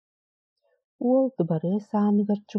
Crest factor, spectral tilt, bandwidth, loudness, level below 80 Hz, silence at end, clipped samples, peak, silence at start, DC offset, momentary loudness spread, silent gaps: 14 dB; -10.5 dB/octave; 6.4 kHz; -25 LUFS; -78 dBFS; 0 s; under 0.1%; -12 dBFS; 1 s; under 0.1%; 4 LU; none